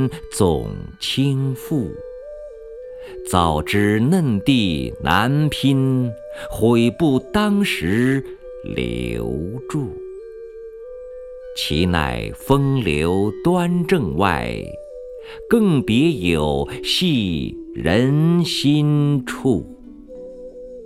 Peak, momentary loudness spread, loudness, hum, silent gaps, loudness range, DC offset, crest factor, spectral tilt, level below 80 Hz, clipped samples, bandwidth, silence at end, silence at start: 0 dBFS; 19 LU; -19 LUFS; none; none; 6 LU; under 0.1%; 20 dB; -6 dB/octave; -38 dBFS; under 0.1%; 15.5 kHz; 0 s; 0 s